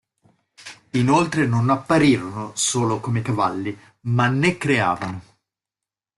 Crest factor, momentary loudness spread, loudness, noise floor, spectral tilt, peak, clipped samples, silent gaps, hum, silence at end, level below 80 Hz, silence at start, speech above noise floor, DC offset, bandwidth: 18 dB; 14 LU; -20 LUFS; -89 dBFS; -5 dB/octave; -4 dBFS; under 0.1%; none; none; 0.95 s; -56 dBFS; 0.6 s; 68 dB; under 0.1%; 12 kHz